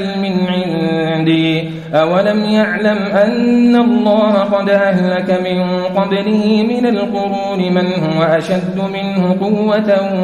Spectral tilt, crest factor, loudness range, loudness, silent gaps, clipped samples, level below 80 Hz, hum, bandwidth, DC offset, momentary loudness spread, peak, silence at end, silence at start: -7.5 dB/octave; 12 dB; 3 LU; -14 LUFS; none; under 0.1%; -52 dBFS; none; 10.5 kHz; under 0.1%; 5 LU; -2 dBFS; 0 s; 0 s